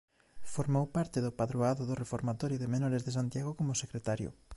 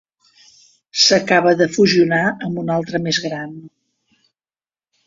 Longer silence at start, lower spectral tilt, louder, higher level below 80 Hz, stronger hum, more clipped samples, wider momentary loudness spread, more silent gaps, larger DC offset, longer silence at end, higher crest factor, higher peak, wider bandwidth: second, 0.1 s vs 0.95 s; first, -6.5 dB/octave vs -4 dB/octave; second, -34 LUFS vs -16 LUFS; about the same, -60 dBFS vs -58 dBFS; neither; neither; second, 5 LU vs 13 LU; neither; neither; second, 0 s vs 1.4 s; about the same, 16 dB vs 18 dB; second, -18 dBFS vs -2 dBFS; first, 11.5 kHz vs 7.8 kHz